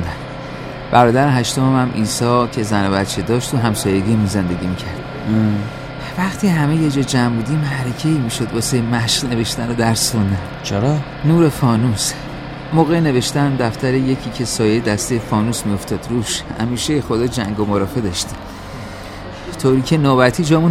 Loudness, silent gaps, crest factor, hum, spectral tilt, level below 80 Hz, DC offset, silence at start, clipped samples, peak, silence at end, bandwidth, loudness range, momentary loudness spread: -17 LUFS; none; 16 dB; none; -5.5 dB/octave; -38 dBFS; under 0.1%; 0 s; under 0.1%; 0 dBFS; 0 s; 16 kHz; 3 LU; 13 LU